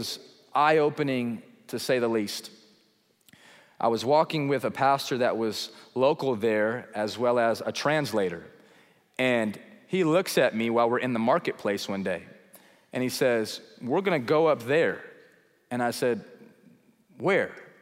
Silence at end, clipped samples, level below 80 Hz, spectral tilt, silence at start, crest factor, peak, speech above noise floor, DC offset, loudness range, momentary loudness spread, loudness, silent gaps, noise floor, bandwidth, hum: 0.15 s; under 0.1%; -76 dBFS; -5 dB/octave; 0 s; 18 dB; -8 dBFS; 40 dB; under 0.1%; 3 LU; 11 LU; -26 LUFS; none; -66 dBFS; 16 kHz; none